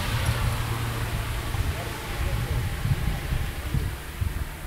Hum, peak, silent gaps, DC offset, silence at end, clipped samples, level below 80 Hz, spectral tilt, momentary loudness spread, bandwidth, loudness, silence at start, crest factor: none; -12 dBFS; none; under 0.1%; 0 s; under 0.1%; -32 dBFS; -5 dB/octave; 5 LU; 16 kHz; -29 LUFS; 0 s; 16 dB